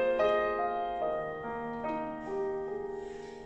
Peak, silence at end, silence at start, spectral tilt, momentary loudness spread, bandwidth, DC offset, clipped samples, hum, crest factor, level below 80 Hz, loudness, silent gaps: -16 dBFS; 0 s; 0 s; -6 dB/octave; 10 LU; 8.2 kHz; under 0.1%; under 0.1%; none; 16 dB; -58 dBFS; -34 LUFS; none